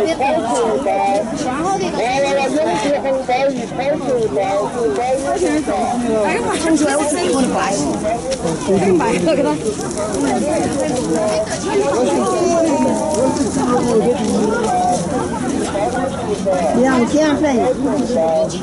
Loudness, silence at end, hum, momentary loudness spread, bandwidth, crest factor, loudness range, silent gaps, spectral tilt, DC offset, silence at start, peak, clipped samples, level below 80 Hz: -17 LUFS; 0 s; none; 5 LU; 12 kHz; 14 dB; 1 LU; none; -5 dB/octave; under 0.1%; 0 s; -4 dBFS; under 0.1%; -42 dBFS